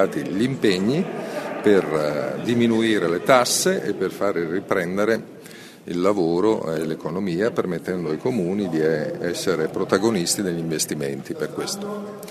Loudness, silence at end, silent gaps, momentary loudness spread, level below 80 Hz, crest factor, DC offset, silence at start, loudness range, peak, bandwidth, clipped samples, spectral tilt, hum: -22 LUFS; 0 s; none; 10 LU; -60 dBFS; 22 dB; under 0.1%; 0 s; 4 LU; 0 dBFS; 13.5 kHz; under 0.1%; -4.5 dB/octave; none